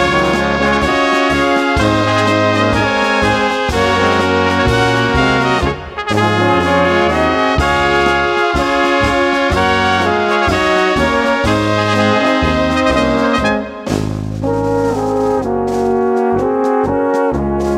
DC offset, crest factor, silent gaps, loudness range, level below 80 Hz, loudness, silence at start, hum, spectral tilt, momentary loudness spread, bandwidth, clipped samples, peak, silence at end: under 0.1%; 14 dB; none; 3 LU; -30 dBFS; -13 LUFS; 0 s; none; -5.5 dB/octave; 4 LU; 15 kHz; under 0.1%; 0 dBFS; 0 s